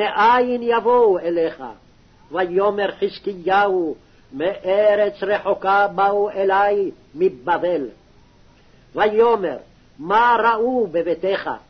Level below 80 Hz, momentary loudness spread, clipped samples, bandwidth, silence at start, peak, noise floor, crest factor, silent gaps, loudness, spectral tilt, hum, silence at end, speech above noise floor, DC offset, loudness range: -56 dBFS; 12 LU; under 0.1%; 6.4 kHz; 0 s; -6 dBFS; -51 dBFS; 14 dB; none; -19 LUFS; -6.5 dB/octave; none; 0.1 s; 32 dB; under 0.1%; 3 LU